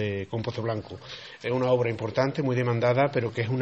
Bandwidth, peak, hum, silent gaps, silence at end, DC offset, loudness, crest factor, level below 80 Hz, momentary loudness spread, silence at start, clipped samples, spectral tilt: 7.8 kHz; -10 dBFS; none; none; 0 s; under 0.1%; -27 LUFS; 16 dB; -62 dBFS; 11 LU; 0 s; under 0.1%; -7.5 dB/octave